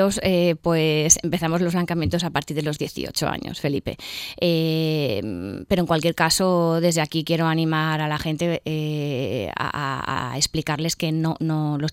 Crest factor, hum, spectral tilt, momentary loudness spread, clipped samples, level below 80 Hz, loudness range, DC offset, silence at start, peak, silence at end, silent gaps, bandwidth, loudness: 22 dB; none; -4.5 dB/octave; 8 LU; under 0.1%; -48 dBFS; 4 LU; under 0.1%; 0 s; -2 dBFS; 0 s; none; 16.5 kHz; -22 LUFS